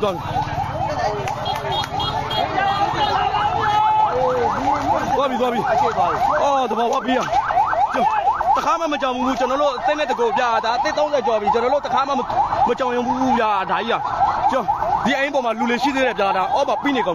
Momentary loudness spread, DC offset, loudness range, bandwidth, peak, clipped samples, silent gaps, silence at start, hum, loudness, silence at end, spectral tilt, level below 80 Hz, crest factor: 4 LU; under 0.1%; 1 LU; 14.5 kHz; -8 dBFS; under 0.1%; none; 0 s; none; -19 LUFS; 0 s; -5 dB/octave; -44 dBFS; 12 dB